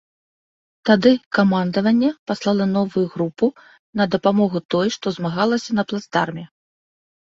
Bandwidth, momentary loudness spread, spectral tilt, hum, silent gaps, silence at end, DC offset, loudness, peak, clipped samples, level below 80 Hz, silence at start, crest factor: 7.6 kHz; 8 LU; -6.5 dB/octave; none; 1.26-1.31 s, 2.19-2.26 s, 3.79-3.93 s, 4.65-4.69 s; 0.9 s; under 0.1%; -20 LUFS; -2 dBFS; under 0.1%; -60 dBFS; 0.85 s; 18 dB